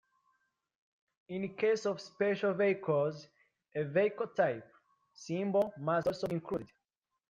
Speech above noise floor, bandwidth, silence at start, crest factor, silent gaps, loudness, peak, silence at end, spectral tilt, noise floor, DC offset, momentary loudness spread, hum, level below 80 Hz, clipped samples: 55 dB; 9.6 kHz; 1.3 s; 18 dB; none; -34 LUFS; -18 dBFS; 0.65 s; -6.5 dB/octave; -88 dBFS; under 0.1%; 10 LU; none; -74 dBFS; under 0.1%